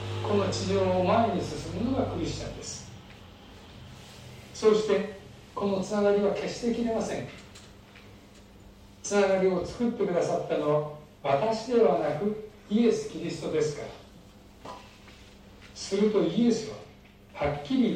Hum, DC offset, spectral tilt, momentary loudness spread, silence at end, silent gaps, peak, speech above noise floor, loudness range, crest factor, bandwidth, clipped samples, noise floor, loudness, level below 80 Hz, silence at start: none; under 0.1%; -5.5 dB/octave; 22 LU; 0 s; none; -10 dBFS; 25 dB; 5 LU; 18 dB; 12 kHz; under 0.1%; -52 dBFS; -28 LUFS; -54 dBFS; 0 s